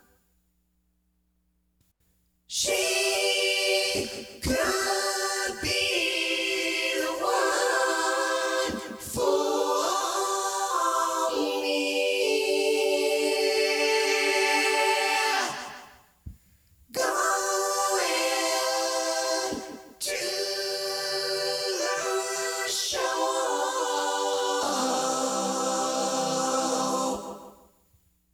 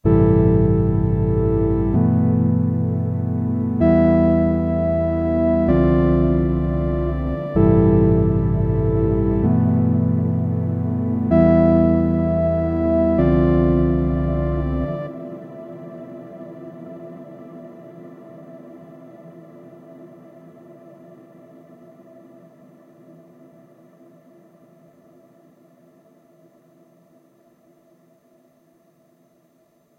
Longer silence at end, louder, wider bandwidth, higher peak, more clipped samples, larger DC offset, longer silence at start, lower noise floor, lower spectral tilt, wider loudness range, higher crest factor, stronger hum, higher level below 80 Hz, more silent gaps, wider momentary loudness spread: second, 0.8 s vs 9.9 s; second, -26 LUFS vs -18 LUFS; first, over 20 kHz vs 4.2 kHz; second, -10 dBFS vs -2 dBFS; neither; neither; first, 2.5 s vs 0.05 s; first, -71 dBFS vs -60 dBFS; second, -1 dB/octave vs -12 dB/octave; second, 4 LU vs 20 LU; about the same, 16 dB vs 18 dB; neither; second, -58 dBFS vs -32 dBFS; neither; second, 6 LU vs 22 LU